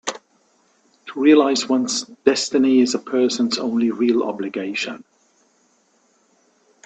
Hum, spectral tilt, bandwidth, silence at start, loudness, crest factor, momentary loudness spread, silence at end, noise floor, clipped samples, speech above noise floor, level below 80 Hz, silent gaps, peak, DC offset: none; -3.5 dB/octave; 9 kHz; 0.05 s; -19 LUFS; 20 dB; 13 LU; 1.9 s; -61 dBFS; under 0.1%; 43 dB; -68 dBFS; none; 0 dBFS; under 0.1%